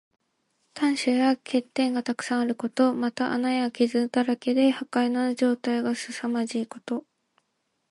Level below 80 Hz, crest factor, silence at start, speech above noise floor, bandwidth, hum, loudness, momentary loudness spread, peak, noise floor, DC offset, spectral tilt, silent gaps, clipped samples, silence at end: -78 dBFS; 16 dB; 0.75 s; 51 dB; 11.5 kHz; none; -26 LUFS; 7 LU; -10 dBFS; -76 dBFS; under 0.1%; -4 dB/octave; none; under 0.1%; 0.9 s